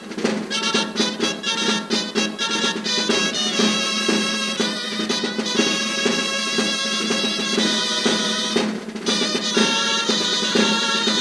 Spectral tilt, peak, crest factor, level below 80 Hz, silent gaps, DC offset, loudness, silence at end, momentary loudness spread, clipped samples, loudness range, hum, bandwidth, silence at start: -2 dB/octave; -4 dBFS; 18 dB; -64 dBFS; none; under 0.1%; -19 LUFS; 0 s; 5 LU; under 0.1%; 1 LU; none; 11 kHz; 0 s